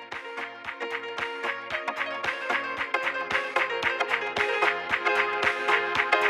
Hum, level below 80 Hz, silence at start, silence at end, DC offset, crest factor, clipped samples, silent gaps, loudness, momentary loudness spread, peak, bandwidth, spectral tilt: none; -64 dBFS; 0 s; 0 s; under 0.1%; 22 dB; under 0.1%; none; -27 LUFS; 9 LU; -6 dBFS; 15 kHz; -2.5 dB/octave